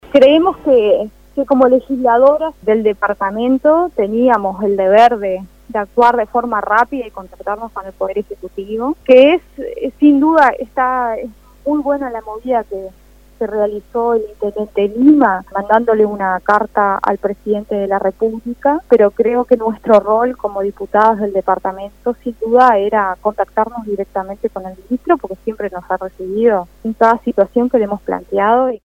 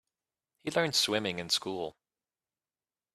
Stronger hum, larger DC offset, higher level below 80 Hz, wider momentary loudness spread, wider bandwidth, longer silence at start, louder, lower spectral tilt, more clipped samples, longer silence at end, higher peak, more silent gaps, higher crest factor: neither; neither; first, -46 dBFS vs -74 dBFS; about the same, 13 LU vs 14 LU; about the same, 15.5 kHz vs 14.5 kHz; second, 0.1 s vs 0.65 s; first, -14 LUFS vs -30 LUFS; first, -7 dB/octave vs -2.5 dB/octave; neither; second, 0.1 s vs 1.25 s; first, 0 dBFS vs -12 dBFS; neither; second, 14 dB vs 22 dB